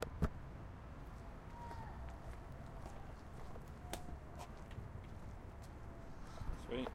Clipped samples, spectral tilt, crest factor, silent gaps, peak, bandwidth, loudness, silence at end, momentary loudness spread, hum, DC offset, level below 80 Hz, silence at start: under 0.1%; -6 dB/octave; 24 dB; none; -24 dBFS; 16 kHz; -51 LUFS; 0 s; 9 LU; none; under 0.1%; -52 dBFS; 0 s